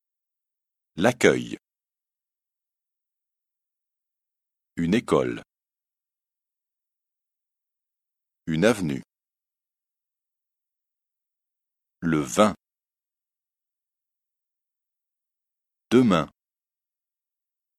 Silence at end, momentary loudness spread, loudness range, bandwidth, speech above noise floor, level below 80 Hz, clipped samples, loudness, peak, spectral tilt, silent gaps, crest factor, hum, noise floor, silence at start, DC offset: 1.5 s; 19 LU; 7 LU; 14.5 kHz; over 68 dB; -60 dBFS; under 0.1%; -23 LUFS; -2 dBFS; -5.5 dB/octave; none; 28 dB; none; under -90 dBFS; 0.95 s; under 0.1%